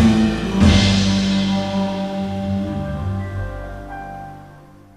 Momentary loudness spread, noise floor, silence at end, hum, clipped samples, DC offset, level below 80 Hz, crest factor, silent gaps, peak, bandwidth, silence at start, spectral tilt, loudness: 18 LU; -43 dBFS; 0.35 s; none; under 0.1%; 0.1%; -30 dBFS; 16 dB; none; -2 dBFS; 11.5 kHz; 0 s; -6 dB/octave; -19 LUFS